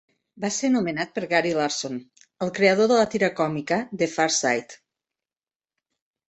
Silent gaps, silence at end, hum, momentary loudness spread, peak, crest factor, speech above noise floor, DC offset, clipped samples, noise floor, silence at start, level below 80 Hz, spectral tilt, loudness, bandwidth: none; 1.55 s; none; 11 LU; -4 dBFS; 20 dB; over 67 dB; under 0.1%; under 0.1%; under -90 dBFS; 0.35 s; -66 dBFS; -3.5 dB/octave; -23 LUFS; 8.4 kHz